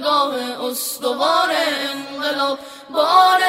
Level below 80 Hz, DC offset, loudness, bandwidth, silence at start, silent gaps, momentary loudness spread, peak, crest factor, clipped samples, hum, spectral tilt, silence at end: -70 dBFS; under 0.1%; -19 LUFS; 16 kHz; 0 s; none; 10 LU; -2 dBFS; 18 dB; under 0.1%; none; -1 dB/octave; 0 s